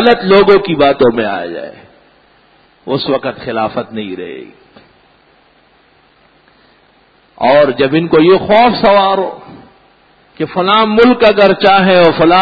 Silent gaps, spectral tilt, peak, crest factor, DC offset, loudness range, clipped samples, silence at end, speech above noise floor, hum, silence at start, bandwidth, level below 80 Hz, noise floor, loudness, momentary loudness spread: none; -8 dB/octave; 0 dBFS; 12 dB; under 0.1%; 13 LU; under 0.1%; 0 s; 40 dB; none; 0 s; 5.2 kHz; -46 dBFS; -49 dBFS; -10 LUFS; 16 LU